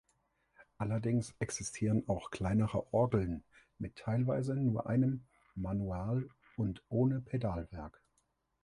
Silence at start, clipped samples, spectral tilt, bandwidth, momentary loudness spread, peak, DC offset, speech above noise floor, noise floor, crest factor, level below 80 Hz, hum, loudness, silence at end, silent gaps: 0.6 s; under 0.1%; -7 dB/octave; 11.5 kHz; 12 LU; -18 dBFS; under 0.1%; 44 dB; -79 dBFS; 18 dB; -54 dBFS; none; -35 LUFS; 0.75 s; none